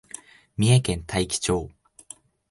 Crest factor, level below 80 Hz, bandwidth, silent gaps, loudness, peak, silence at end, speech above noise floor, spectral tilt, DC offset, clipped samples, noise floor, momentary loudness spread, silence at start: 18 dB; -44 dBFS; 11.5 kHz; none; -23 LUFS; -8 dBFS; 0.85 s; 27 dB; -5 dB/octave; under 0.1%; under 0.1%; -49 dBFS; 24 LU; 0.6 s